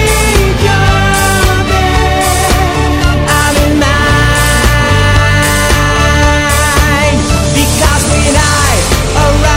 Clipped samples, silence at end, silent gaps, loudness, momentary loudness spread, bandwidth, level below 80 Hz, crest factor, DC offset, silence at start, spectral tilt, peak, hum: 0.1%; 0 s; none; -9 LUFS; 2 LU; 16.5 kHz; -14 dBFS; 8 dB; under 0.1%; 0 s; -4 dB/octave; 0 dBFS; none